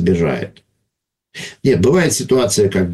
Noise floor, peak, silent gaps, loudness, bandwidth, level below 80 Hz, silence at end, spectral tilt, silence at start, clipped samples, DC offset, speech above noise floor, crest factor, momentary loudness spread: -77 dBFS; -2 dBFS; none; -15 LUFS; 12.5 kHz; -42 dBFS; 0 s; -5 dB/octave; 0 s; under 0.1%; under 0.1%; 62 dB; 14 dB; 18 LU